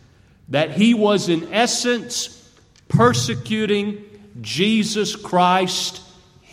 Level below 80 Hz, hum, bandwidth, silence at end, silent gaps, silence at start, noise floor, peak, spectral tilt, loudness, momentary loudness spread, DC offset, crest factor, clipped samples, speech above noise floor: -56 dBFS; none; 15.5 kHz; 0.5 s; none; 0.5 s; -52 dBFS; -2 dBFS; -4.5 dB/octave; -19 LUFS; 11 LU; under 0.1%; 18 dB; under 0.1%; 33 dB